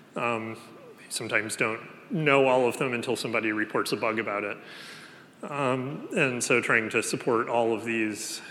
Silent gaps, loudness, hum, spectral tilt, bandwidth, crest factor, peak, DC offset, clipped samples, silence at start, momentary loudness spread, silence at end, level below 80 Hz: none; -27 LUFS; none; -4 dB/octave; 17.5 kHz; 20 dB; -6 dBFS; under 0.1%; under 0.1%; 0.15 s; 15 LU; 0 s; -82 dBFS